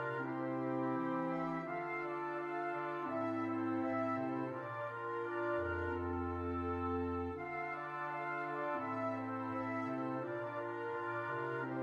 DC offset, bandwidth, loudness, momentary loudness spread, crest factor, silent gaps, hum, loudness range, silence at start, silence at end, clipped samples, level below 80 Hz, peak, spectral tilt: under 0.1%; 7 kHz; -40 LUFS; 4 LU; 12 dB; none; none; 1 LU; 0 s; 0 s; under 0.1%; -64 dBFS; -26 dBFS; -8.5 dB/octave